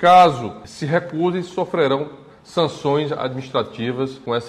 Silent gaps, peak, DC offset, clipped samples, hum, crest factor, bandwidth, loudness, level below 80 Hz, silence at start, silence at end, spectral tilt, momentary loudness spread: none; -2 dBFS; under 0.1%; under 0.1%; none; 16 dB; 11 kHz; -20 LUFS; -58 dBFS; 0 s; 0 s; -6 dB/octave; 11 LU